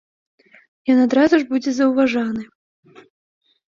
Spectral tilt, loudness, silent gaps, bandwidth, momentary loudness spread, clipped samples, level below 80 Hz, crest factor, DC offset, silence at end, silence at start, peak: -5 dB/octave; -18 LUFS; none; 7.4 kHz; 12 LU; under 0.1%; -62 dBFS; 18 dB; under 0.1%; 1.3 s; 0.85 s; -2 dBFS